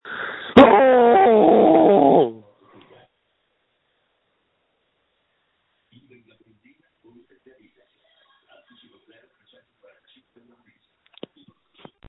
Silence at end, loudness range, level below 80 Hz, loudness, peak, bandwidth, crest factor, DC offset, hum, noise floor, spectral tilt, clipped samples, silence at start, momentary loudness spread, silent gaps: 9.75 s; 9 LU; -56 dBFS; -14 LUFS; 0 dBFS; 6 kHz; 20 dB; under 0.1%; none; -70 dBFS; -8 dB/octave; under 0.1%; 0.05 s; 12 LU; none